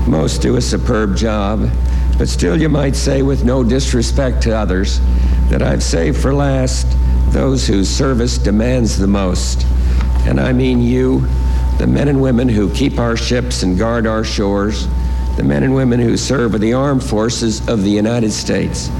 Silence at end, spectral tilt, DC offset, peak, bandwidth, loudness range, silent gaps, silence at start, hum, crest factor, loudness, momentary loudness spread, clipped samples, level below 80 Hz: 0 s; -6 dB/octave; under 0.1%; -2 dBFS; 12 kHz; 1 LU; none; 0 s; none; 12 dB; -15 LUFS; 3 LU; under 0.1%; -18 dBFS